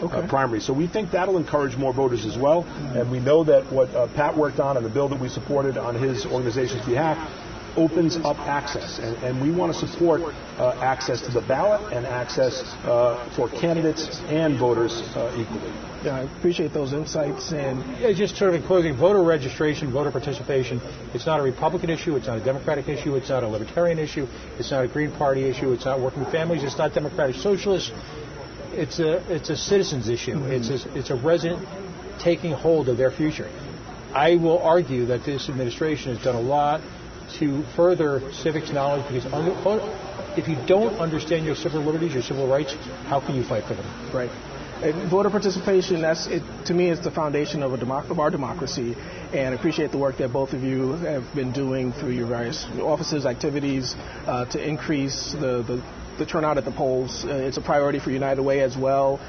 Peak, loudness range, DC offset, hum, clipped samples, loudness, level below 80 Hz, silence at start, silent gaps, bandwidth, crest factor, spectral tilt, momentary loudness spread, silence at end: -6 dBFS; 4 LU; under 0.1%; none; under 0.1%; -24 LUFS; -46 dBFS; 0 s; none; 6.6 kHz; 18 dB; -6 dB/octave; 9 LU; 0 s